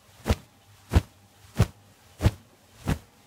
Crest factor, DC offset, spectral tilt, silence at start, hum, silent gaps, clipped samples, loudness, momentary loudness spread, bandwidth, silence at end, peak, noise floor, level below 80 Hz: 22 dB; under 0.1%; -6.5 dB/octave; 0.25 s; none; none; under 0.1%; -29 LUFS; 13 LU; 16 kHz; 0.3 s; -6 dBFS; -55 dBFS; -36 dBFS